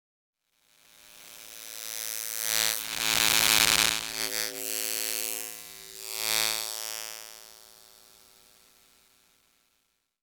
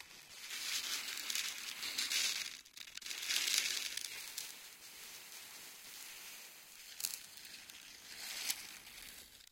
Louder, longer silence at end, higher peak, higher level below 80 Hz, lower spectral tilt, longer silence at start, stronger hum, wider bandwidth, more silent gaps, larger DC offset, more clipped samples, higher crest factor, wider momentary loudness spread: first, -26 LUFS vs -40 LUFS; first, 2.45 s vs 0.05 s; first, 0 dBFS vs -14 dBFS; first, -60 dBFS vs -80 dBFS; first, 1 dB/octave vs 2.5 dB/octave; first, 1.05 s vs 0 s; neither; first, over 20 kHz vs 17 kHz; neither; neither; neither; about the same, 32 dB vs 30 dB; first, 22 LU vs 17 LU